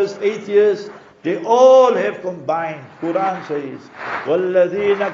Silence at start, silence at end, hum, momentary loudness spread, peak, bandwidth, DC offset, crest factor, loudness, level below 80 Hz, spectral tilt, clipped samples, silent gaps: 0 s; 0 s; none; 16 LU; -2 dBFS; 7.4 kHz; under 0.1%; 16 dB; -17 LUFS; -66 dBFS; -4 dB/octave; under 0.1%; none